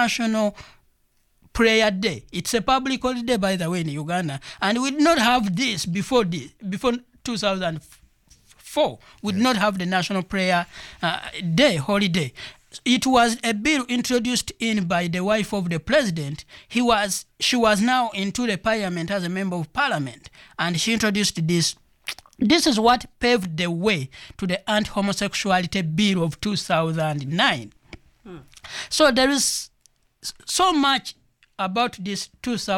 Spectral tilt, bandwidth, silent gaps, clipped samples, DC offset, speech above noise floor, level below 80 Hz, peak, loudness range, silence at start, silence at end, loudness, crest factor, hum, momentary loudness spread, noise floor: -4 dB/octave; 17.5 kHz; none; under 0.1%; under 0.1%; 42 dB; -50 dBFS; -6 dBFS; 3 LU; 0 s; 0 s; -22 LUFS; 18 dB; none; 12 LU; -64 dBFS